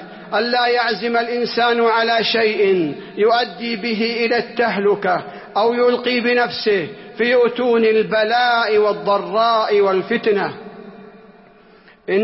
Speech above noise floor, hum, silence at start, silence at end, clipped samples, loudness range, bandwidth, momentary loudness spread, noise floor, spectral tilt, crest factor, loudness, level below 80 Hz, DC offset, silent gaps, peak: 31 dB; none; 0 s; 0 s; under 0.1%; 2 LU; 5.8 kHz; 7 LU; -48 dBFS; -8 dB/octave; 12 dB; -17 LUFS; -62 dBFS; under 0.1%; none; -6 dBFS